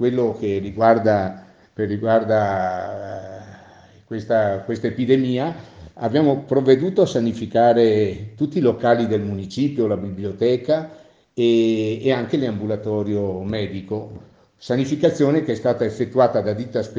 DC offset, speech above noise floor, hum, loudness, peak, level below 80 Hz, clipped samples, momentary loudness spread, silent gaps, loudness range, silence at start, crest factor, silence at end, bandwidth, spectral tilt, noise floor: under 0.1%; 28 dB; none; -20 LUFS; 0 dBFS; -56 dBFS; under 0.1%; 12 LU; none; 5 LU; 0 s; 20 dB; 0 s; 7.8 kHz; -7.5 dB/octave; -47 dBFS